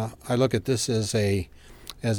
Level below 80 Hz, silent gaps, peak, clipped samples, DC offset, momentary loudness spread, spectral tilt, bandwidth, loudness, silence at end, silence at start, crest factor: -50 dBFS; none; -10 dBFS; under 0.1%; under 0.1%; 18 LU; -5 dB/octave; 19 kHz; -25 LUFS; 0 s; 0 s; 16 dB